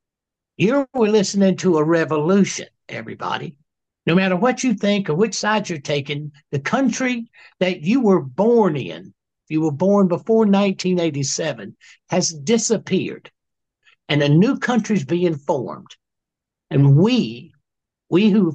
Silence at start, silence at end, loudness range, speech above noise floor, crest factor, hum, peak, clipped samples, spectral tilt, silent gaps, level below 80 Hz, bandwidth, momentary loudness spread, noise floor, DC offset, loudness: 0.6 s; 0 s; 2 LU; 67 dB; 16 dB; none; -4 dBFS; under 0.1%; -5.5 dB/octave; none; -64 dBFS; 8.6 kHz; 13 LU; -86 dBFS; under 0.1%; -19 LUFS